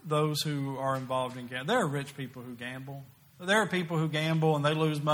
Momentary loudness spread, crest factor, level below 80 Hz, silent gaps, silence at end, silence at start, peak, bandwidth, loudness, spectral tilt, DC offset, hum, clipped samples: 14 LU; 18 dB; -72 dBFS; none; 0 s; 0.05 s; -12 dBFS; 17 kHz; -30 LUFS; -5.5 dB/octave; under 0.1%; none; under 0.1%